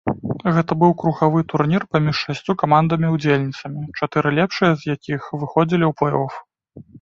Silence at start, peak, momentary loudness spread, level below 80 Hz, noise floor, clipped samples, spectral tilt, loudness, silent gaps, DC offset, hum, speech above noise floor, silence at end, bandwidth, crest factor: 0.05 s; -2 dBFS; 9 LU; -52 dBFS; -43 dBFS; under 0.1%; -7.5 dB/octave; -19 LUFS; none; under 0.1%; none; 25 dB; 0.2 s; 7.2 kHz; 18 dB